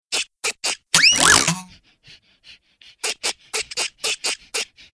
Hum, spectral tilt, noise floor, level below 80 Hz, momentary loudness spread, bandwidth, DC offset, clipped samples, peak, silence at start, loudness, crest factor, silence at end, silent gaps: none; 0 dB/octave; -51 dBFS; -52 dBFS; 14 LU; 11 kHz; under 0.1%; under 0.1%; 0 dBFS; 0.1 s; -18 LUFS; 22 dB; 0.3 s; none